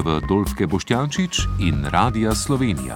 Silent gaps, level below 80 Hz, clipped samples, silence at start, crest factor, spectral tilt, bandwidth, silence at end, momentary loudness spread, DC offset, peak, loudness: none; -32 dBFS; under 0.1%; 0 s; 18 dB; -5 dB/octave; 17.5 kHz; 0 s; 3 LU; under 0.1%; -4 dBFS; -21 LUFS